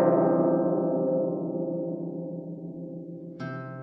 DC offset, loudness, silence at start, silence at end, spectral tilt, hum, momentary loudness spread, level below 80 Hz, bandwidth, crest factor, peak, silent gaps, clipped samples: under 0.1%; -28 LUFS; 0 s; 0 s; -11.5 dB/octave; none; 16 LU; -74 dBFS; 5.8 kHz; 16 dB; -10 dBFS; none; under 0.1%